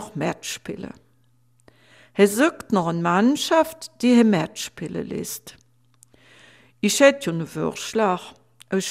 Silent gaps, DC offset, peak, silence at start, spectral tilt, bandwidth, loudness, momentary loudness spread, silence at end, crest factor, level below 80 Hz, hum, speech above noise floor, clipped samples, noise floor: none; under 0.1%; 0 dBFS; 0 s; -4.5 dB/octave; 16 kHz; -22 LUFS; 15 LU; 0 s; 22 dB; -62 dBFS; none; 41 dB; under 0.1%; -62 dBFS